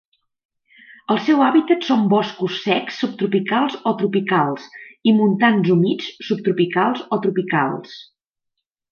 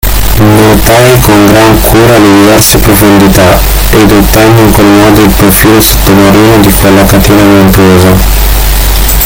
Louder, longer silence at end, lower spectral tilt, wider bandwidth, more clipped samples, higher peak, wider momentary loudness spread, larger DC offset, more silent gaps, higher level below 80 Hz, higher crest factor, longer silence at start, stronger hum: second, -19 LUFS vs -3 LUFS; first, 0.9 s vs 0 s; first, -7 dB/octave vs -5 dB/octave; second, 6.8 kHz vs over 20 kHz; second, under 0.1% vs 20%; about the same, -2 dBFS vs 0 dBFS; first, 10 LU vs 4 LU; neither; neither; second, -68 dBFS vs -12 dBFS; first, 16 dB vs 2 dB; first, 1.1 s vs 0.05 s; neither